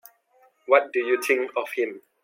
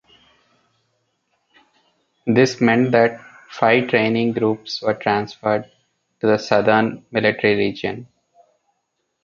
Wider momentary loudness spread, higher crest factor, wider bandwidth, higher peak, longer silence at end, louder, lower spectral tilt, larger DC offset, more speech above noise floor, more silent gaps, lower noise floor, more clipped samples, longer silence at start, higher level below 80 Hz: about the same, 9 LU vs 10 LU; about the same, 22 dB vs 20 dB; first, 16.5 kHz vs 7.6 kHz; about the same, -4 dBFS vs -2 dBFS; second, 0.25 s vs 1.2 s; second, -23 LUFS vs -18 LUFS; second, -2 dB/octave vs -6 dB/octave; neither; second, 38 dB vs 55 dB; neither; second, -61 dBFS vs -73 dBFS; neither; second, 0.7 s vs 2.25 s; second, -86 dBFS vs -60 dBFS